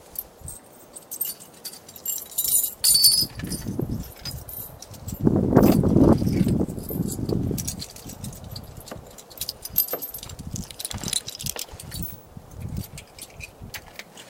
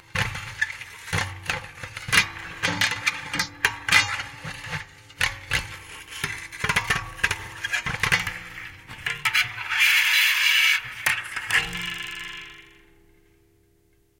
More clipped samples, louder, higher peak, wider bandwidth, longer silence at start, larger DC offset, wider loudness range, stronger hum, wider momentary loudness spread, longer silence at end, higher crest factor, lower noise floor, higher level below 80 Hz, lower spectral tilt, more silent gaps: neither; about the same, -23 LUFS vs -23 LUFS; first, 0 dBFS vs -4 dBFS; about the same, 17 kHz vs 17 kHz; about the same, 0.05 s vs 0.15 s; neither; first, 11 LU vs 7 LU; neither; first, 22 LU vs 18 LU; second, 0 s vs 1.5 s; about the same, 26 dB vs 24 dB; second, -46 dBFS vs -62 dBFS; first, -42 dBFS vs -48 dBFS; first, -4 dB/octave vs -1 dB/octave; neither